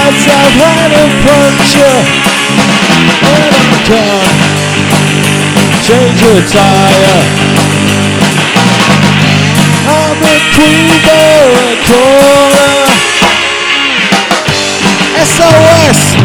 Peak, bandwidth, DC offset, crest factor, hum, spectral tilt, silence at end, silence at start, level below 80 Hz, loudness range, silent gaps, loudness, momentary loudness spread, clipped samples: 0 dBFS; over 20 kHz; under 0.1%; 6 dB; none; -4 dB/octave; 0 s; 0 s; -32 dBFS; 2 LU; none; -5 LUFS; 4 LU; 10%